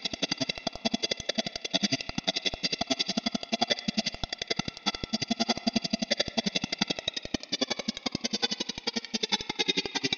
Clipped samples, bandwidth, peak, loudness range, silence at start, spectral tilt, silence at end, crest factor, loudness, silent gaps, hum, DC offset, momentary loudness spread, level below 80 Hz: under 0.1%; 9 kHz; -10 dBFS; 1 LU; 0 s; -2.5 dB/octave; 0 s; 22 dB; -30 LUFS; none; none; under 0.1%; 5 LU; -56 dBFS